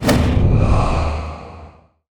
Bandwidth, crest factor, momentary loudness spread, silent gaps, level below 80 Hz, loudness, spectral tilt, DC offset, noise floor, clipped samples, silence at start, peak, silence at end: over 20 kHz; 14 dB; 18 LU; none; -22 dBFS; -17 LUFS; -6.5 dB/octave; under 0.1%; -43 dBFS; under 0.1%; 0 s; -2 dBFS; 0.4 s